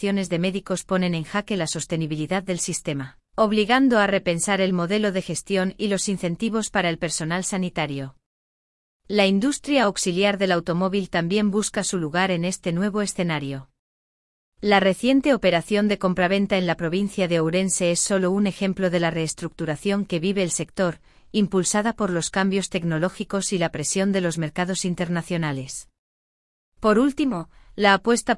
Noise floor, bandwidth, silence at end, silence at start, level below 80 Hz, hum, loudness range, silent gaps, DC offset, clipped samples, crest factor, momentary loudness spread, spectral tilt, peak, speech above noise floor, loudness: under -90 dBFS; 12 kHz; 0 s; 0 s; -52 dBFS; none; 4 LU; 8.26-9.00 s, 13.79-14.52 s, 25.99-26.72 s; under 0.1%; under 0.1%; 18 dB; 8 LU; -4.5 dB/octave; -4 dBFS; over 68 dB; -23 LUFS